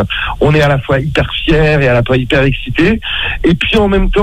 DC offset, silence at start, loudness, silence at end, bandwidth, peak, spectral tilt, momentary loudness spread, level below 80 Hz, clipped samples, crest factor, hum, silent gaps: under 0.1%; 0 s; -11 LUFS; 0 s; 12 kHz; 0 dBFS; -7 dB/octave; 4 LU; -22 dBFS; under 0.1%; 10 dB; none; none